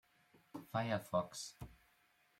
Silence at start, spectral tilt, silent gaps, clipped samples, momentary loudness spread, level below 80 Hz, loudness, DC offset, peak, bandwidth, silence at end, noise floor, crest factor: 0.55 s; -5 dB/octave; none; under 0.1%; 18 LU; -70 dBFS; -41 LUFS; under 0.1%; -24 dBFS; 16.5 kHz; 0.65 s; -74 dBFS; 20 dB